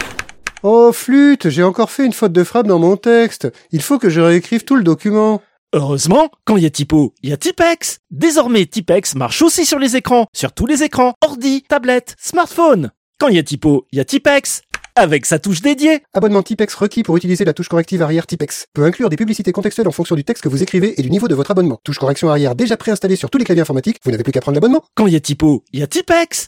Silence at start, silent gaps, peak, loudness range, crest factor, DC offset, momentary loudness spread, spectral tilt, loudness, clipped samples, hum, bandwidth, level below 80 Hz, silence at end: 0 s; 5.58-5.67 s, 7.99-8.04 s, 10.28-10.33 s, 11.15-11.21 s, 12.97-13.13 s, 18.68-18.72 s; 0 dBFS; 3 LU; 14 dB; under 0.1%; 7 LU; -5 dB/octave; -14 LUFS; under 0.1%; none; 16.5 kHz; -44 dBFS; 0 s